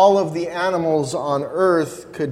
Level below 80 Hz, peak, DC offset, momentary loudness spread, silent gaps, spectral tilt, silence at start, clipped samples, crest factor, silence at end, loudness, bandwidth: -60 dBFS; -2 dBFS; under 0.1%; 6 LU; none; -5.5 dB/octave; 0 s; under 0.1%; 16 dB; 0 s; -20 LUFS; 13.5 kHz